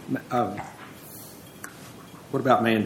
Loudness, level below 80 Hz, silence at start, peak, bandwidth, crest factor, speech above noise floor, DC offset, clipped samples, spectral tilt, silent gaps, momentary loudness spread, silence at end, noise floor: -26 LUFS; -66 dBFS; 0 s; -6 dBFS; 17 kHz; 20 dB; 20 dB; under 0.1%; under 0.1%; -6 dB/octave; none; 22 LU; 0 s; -44 dBFS